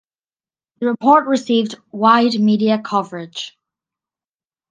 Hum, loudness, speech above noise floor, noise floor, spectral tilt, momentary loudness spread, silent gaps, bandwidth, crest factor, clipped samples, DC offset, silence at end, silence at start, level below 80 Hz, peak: none; -16 LUFS; over 74 dB; under -90 dBFS; -5.5 dB/octave; 15 LU; none; 9.2 kHz; 18 dB; under 0.1%; under 0.1%; 1.2 s; 0.8 s; -68 dBFS; 0 dBFS